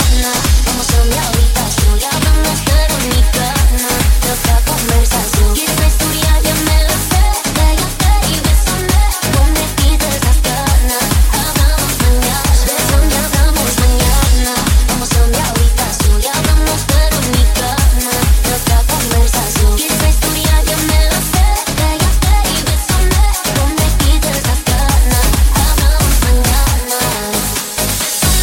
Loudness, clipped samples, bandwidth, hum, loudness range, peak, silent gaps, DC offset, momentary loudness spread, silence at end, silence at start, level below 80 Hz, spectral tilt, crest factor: -12 LUFS; under 0.1%; 17 kHz; none; 1 LU; 0 dBFS; none; under 0.1%; 2 LU; 0 s; 0 s; -12 dBFS; -3.5 dB/octave; 10 dB